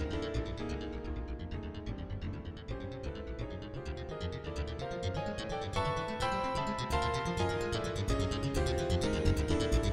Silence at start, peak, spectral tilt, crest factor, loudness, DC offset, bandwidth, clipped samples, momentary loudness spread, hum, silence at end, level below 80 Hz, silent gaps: 0 s; -16 dBFS; -5.5 dB/octave; 18 dB; -36 LUFS; under 0.1%; 15.5 kHz; under 0.1%; 10 LU; none; 0 s; -42 dBFS; none